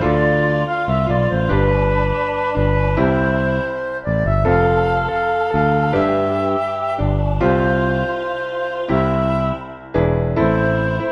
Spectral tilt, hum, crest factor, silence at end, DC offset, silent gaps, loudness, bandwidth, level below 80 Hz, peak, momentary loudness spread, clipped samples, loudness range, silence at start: -9 dB/octave; none; 14 dB; 0 s; under 0.1%; none; -18 LUFS; 7.2 kHz; -28 dBFS; -2 dBFS; 6 LU; under 0.1%; 2 LU; 0 s